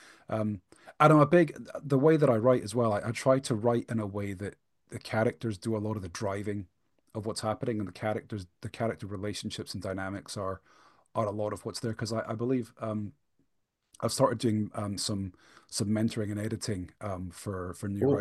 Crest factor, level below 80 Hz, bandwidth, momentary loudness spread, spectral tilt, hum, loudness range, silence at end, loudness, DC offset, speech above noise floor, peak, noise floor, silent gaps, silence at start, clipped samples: 24 dB; -64 dBFS; 12.5 kHz; 14 LU; -6 dB/octave; none; 10 LU; 0 s; -30 LUFS; under 0.1%; 48 dB; -6 dBFS; -78 dBFS; none; 0.3 s; under 0.1%